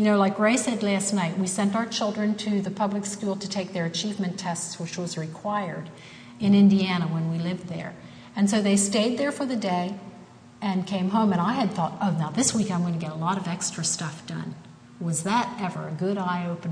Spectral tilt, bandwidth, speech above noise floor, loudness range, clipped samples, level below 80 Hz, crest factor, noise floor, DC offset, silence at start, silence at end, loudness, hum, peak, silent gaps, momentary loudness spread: -5 dB/octave; 10.5 kHz; 22 dB; 5 LU; under 0.1%; -66 dBFS; 16 dB; -47 dBFS; under 0.1%; 0 s; 0 s; -25 LUFS; none; -10 dBFS; none; 13 LU